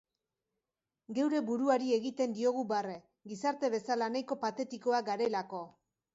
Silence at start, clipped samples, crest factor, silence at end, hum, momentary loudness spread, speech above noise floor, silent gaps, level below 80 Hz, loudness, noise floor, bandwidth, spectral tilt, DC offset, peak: 1.1 s; under 0.1%; 18 dB; 0.45 s; none; 13 LU; over 57 dB; none; -82 dBFS; -34 LUFS; under -90 dBFS; 8 kHz; -5 dB/octave; under 0.1%; -16 dBFS